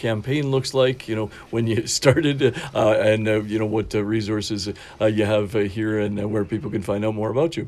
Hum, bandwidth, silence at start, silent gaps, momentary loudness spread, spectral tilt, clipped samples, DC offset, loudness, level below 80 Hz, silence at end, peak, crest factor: none; 13.5 kHz; 0 s; none; 8 LU; -5.5 dB/octave; under 0.1%; under 0.1%; -22 LUFS; -50 dBFS; 0 s; -2 dBFS; 20 dB